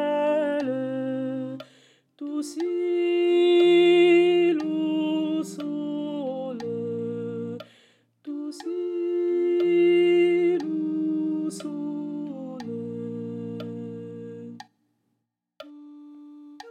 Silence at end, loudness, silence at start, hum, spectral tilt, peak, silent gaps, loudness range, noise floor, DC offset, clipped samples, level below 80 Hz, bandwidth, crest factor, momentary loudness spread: 0 s; -24 LUFS; 0 s; none; -6 dB/octave; -10 dBFS; none; 16 LU; -79 dBFS; under 0.1%; under 0.1%; -82 dBFS; 10 kHz; 16 dB; 19 LU